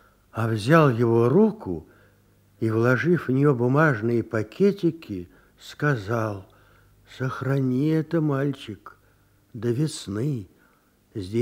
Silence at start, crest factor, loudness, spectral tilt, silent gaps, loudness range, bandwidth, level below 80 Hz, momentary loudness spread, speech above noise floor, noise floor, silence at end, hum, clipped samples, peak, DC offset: 0.35 s; 20 dB; -23 LUFS; -7.5 dB/octave; none; 6 LU; 15.5 kHz; -60 dBFS; 17 LU; 38 dB; -61 dBFS; 0 s; none; under 0.1%; -4 dBFS; under 0.1%